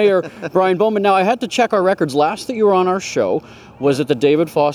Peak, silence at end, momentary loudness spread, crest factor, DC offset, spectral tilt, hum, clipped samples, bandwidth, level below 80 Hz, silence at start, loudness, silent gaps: -2 dBFS; 0 s; 5 LU; 14 dB; under 0.1%; -5.5 dB/octave; none; under 0.1%; 15 kHz; -58 dBFS; 0 s; -16 LUFS; none